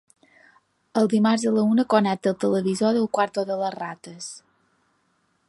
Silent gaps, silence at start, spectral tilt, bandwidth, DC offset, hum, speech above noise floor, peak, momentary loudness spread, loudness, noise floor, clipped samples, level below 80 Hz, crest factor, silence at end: none; 0.95 s; -5.5 dB/octave; 11.5 kHz; under 0.1%; none; 46 dB; -4 dBFS; 17 LU; -22 LUFS; -68 dBFS; under 0.1%; -68 dBFS; 20 dB; 1.1 s